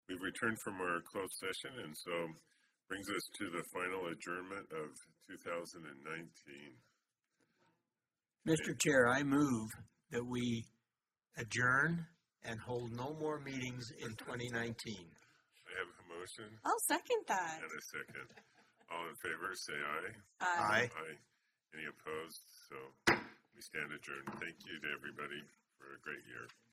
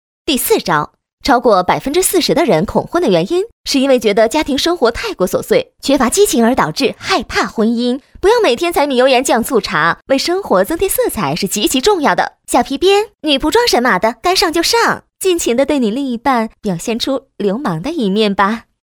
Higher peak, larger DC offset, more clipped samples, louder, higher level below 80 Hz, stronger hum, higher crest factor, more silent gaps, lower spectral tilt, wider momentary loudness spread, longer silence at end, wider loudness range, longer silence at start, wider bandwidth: second, -18 dBFS vs 0 dBFS; neither; neither; second, -40 LUFS vs -14 LUFS; second, -74 dBFS vs -40 dBFS; neither; first, 24 dB vs 14 dB; second, none vs 1.13-1.18 s, 3.52-3.64 s; about the same, -4 dB/octave vs -3.5 dB/octave; first, 18 LU vs 6 LU; second, 0.2 s vs 0.35 s; first, 9 LU vs 2 LU; second, 0.1 s vs 0.25 s; second, 15.5 kHz vs over 20 kHz